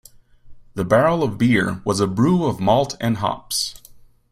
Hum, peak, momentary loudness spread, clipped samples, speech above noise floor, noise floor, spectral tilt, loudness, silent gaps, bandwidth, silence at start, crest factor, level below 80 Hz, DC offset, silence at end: none; -2 dBFS; 7 LU; under 0.1%; 28 dB; -47 dBFS; -5.5 dB/octave; -19 LUFS; none; 15.5 kHz; 0.45 s; 18 dB; -48 dBFS; under 0.1%; 0.35 s